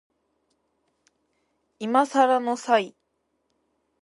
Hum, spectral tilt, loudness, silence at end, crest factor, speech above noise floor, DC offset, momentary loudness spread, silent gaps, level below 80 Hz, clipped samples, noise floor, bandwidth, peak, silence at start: none; -4 dB/octave; -22 LUFS; 1.15 s; 22 dB; 52 dB; under 0.1%; 12 LU; none; -82 dBFS; under 0.1%; -74 dBFS; 11.5 kHz; -6 dBFS; 1.8 s